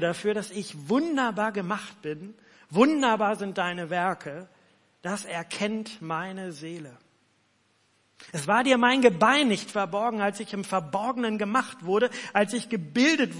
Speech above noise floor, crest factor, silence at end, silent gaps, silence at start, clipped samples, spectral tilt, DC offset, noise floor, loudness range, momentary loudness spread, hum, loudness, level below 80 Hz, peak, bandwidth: 41 dB; 20 dB; 0 s; none; 0 s; under 0.1%; -4.5 dB/octave; under 0.1%; -67 dBFS; 11 LU; 16 LU; none; -26 LUFS; -78 dBFS; -6 dBFS; 11.5 kHz